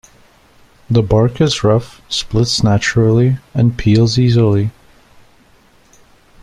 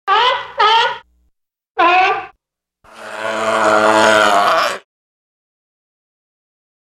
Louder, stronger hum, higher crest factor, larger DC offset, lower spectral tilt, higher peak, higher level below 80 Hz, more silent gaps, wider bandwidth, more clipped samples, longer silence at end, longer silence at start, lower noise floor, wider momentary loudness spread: about the same, -14 LUFS vs -13 LUFS; neither; about the same, 14 dB vs 16 dB; neither; first, -6 dB/octave vs -2 dB/octave; about the same, -2 dBFS vs -2 dBFS; first, -36 dBFS vs -58 dBFS; second, none vs 1.70-1.75 s; second, 11 kHz vs 15 kHz; neither; second, 1.7 s vs 2.1 s; first, 0.9 s vs 0.05 s; second, -49 dBFS vs -72 dBFS; second, 6 LU vs 15 LU